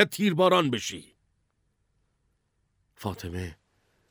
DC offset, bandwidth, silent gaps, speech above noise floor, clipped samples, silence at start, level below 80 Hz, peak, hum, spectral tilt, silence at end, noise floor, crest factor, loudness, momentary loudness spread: under 0.1%; over 20 kHz; none; 48 dB; under 0.1%; 0 s; -58 dBFS; -6 dBFS; none; -5 dB/octave; 0.6 s; -73 dBFS; 24 dB; -26 LUFS; 17 LU